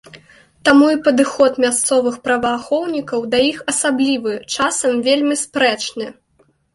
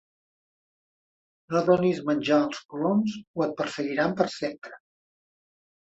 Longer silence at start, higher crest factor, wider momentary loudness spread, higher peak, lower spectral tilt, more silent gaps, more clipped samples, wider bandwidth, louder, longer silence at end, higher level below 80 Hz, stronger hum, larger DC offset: second, 0.15 s vs 1.5 s; about the same, 16 dB vs 20 dB; about the same, 8 LU vs 10 LU; first, -2 dBFS vs -8 dBFS; second, -2 dB/octave vs -6.5 dB/octave; second, none vs 2.65-2.69 s, 3.27-3.34 s; neither; first, 11.5 kHz vs 8.2 kHz; first, -16 LUFS vs -26 LUFS; second, 0.65 s vs 1.2 s; first, -56 dBFS vs -68 dBFS; neither; neither